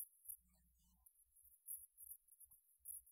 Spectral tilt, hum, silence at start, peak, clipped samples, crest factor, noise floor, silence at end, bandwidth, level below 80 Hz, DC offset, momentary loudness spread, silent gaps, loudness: -0.5 dB/octave; none; 0 s; -36 dBFS; under 0.1%; 24 dB; -77 dBFS; 0 s; 16 kHz; -84 dBFS; under 0.1%; 13 LU; none; -56 LUFS